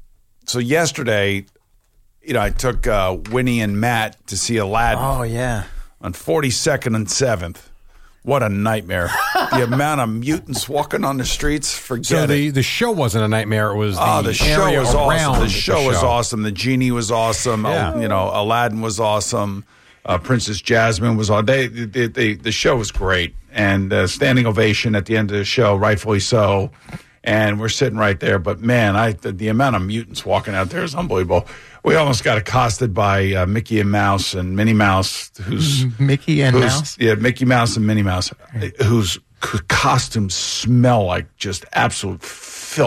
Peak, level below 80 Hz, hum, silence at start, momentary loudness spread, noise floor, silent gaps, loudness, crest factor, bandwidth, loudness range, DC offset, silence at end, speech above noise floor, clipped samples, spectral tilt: -4 dBFS; -34 dBFS; none; 0 s; 8 LU; -55 dBFS; none; -18 LUFS; 14 dB; 16 kHz; 3 LU; under 0.1%; 0 s; 38 dB; under 0.1%; -5 dB/octave